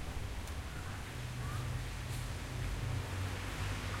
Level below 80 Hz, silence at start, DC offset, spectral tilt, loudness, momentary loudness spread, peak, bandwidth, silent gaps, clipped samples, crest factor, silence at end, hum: -46 dBFS; 0 s; under 0.1%; -4.5 dB/octave; -41 LUFS; 4 LU; -26 dBFS; 16 kHz; none; under 0.1%; 14 dB; 0 s; none